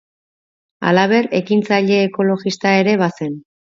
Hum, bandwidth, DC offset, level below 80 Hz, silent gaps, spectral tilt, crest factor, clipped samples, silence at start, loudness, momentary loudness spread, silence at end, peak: none; 7.6 kHz; under 0.1%; -64 dBFS; none; -6 dB/octave; 16 dB; under 0.1%; 0.8 s; -16 LUFS; 9 LU; 0.35 s; 0 dBFS